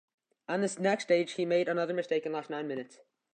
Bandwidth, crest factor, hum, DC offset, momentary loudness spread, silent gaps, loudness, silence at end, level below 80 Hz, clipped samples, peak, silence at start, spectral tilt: 9.4 kHz; 18 dB; none; under 0.1%; 11 LU; none; -31 LUFS; 0.45 s; -86 dBFS; under 0.1%; -14 dBFS; 0.5 s; -5 dB/octave